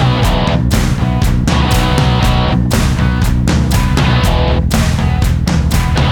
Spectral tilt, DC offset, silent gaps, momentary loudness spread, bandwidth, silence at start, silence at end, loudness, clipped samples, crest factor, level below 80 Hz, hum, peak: -5.5 dB/octave; under 0.1%; none; 2 LU; 20 kHz; 0 s; 0 s; -13 LUFS; under 0.1%; 10 dB; -16 dBFS; none; 0 dBFS